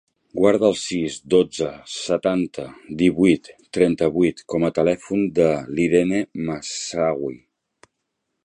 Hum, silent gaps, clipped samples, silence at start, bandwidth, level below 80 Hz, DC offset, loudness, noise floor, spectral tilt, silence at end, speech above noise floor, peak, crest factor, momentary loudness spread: none; none; under 0.1%; 0.35 s; 10.5 kHz; -52 dBFS; under 0.1%; -21 LUFS; -77 dBFS; -5.5 dB/octave; 1.05 s; 57 dB; -2 dBFS; 18 dB; 10 LU